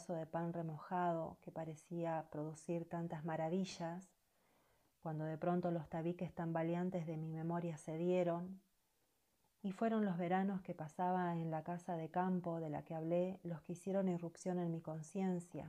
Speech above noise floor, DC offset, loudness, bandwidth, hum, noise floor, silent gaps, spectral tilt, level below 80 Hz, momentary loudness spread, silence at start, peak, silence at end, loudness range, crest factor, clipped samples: 40 dB; under 0.1%; -42 LUFS; 11 kHz; none; -82 dBFS; none; -7.5 dB/octave; -80 dBFS; 9 LU; 0 s; -28 dBFS; 0 s; 4 LU; 14 dB; under 0.1%